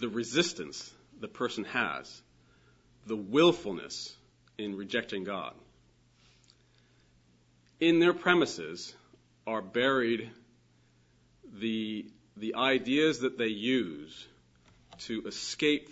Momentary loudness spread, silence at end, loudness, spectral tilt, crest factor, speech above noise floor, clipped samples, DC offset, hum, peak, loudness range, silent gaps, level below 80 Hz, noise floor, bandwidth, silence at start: 20 LU; 0 s; -30 LUFS; -4 dB/octave; 26 dB; 35 dB; under 0.1%; under 0.1%; none; -8 dBFS; 9 LU; none; -70 dBFS; -65 dBFS; 8 kHz; 0 s